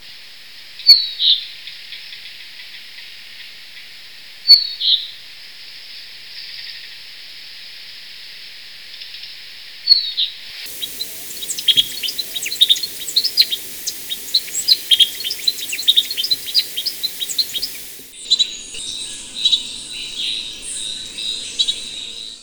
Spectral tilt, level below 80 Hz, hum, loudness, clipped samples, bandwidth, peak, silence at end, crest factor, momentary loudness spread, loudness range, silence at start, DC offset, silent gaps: 2 dB/octave; -56 dBFS; none; -16 LUFS; under 0.1%; over 20 kHz; 0 dBFS; 0 s; 22 dB; 22 LU; 16 LU; 0 s; 0.3%; none